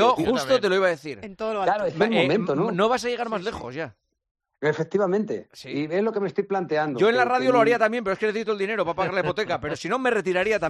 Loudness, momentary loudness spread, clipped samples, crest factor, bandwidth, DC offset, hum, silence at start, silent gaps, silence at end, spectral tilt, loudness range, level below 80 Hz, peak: -24 LUFS; 11 LU; under 0.1%; 16 dB; 13.5 kHz; under 0.1%; none; 0 s; 4.31-4.35 s; 0 s; -5.5 dB/octave; 5 LU; -60 dBFS; -6 dBFS